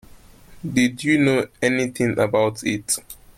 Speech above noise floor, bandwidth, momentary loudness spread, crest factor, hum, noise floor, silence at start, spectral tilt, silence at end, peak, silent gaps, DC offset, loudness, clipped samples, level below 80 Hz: 25 dB; 16.5 kHz; 7 LU; 16 dB; none; -46 dBFS; 0.1 s; -4.5 dB/octave; 0.25 s; -6 dBFS; none; under 0.1%; -21 LUFS; under 0.1%; -52 dBFS